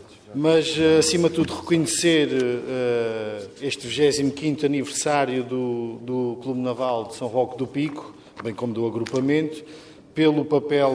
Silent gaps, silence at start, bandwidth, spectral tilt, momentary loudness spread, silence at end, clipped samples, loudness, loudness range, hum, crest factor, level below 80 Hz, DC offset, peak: none; 0 s; 11 kHz; -4.5 dB/octave; 12 LU; 0 s; under 0.1%; -23 LUFS; 6 LU; none; 18 dB; -60 dBFS; under 0.1%; -6 dBFS